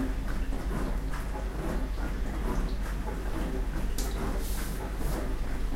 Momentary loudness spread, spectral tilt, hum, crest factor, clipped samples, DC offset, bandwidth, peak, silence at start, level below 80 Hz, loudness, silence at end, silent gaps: 2 LU; -5.5 dB/octave; none; 12 dB; under 0.1%; under 0.1%; 16 kHz; -18 dBFS; 0 s; -32 dBFS; -35 LUFS; 0 s; none